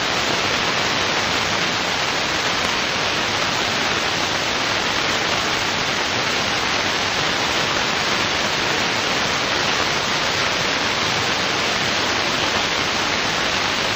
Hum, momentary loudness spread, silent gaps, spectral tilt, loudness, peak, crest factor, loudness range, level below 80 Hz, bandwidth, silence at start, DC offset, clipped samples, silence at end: none; 1 LU; none; -2 dB/octave; -18 LUFS; 0 dBFS; 20 dB; 0 LU; -46 dBFS; 16 kHz; 0 s; under 0.1%; under 0.1%; 0 s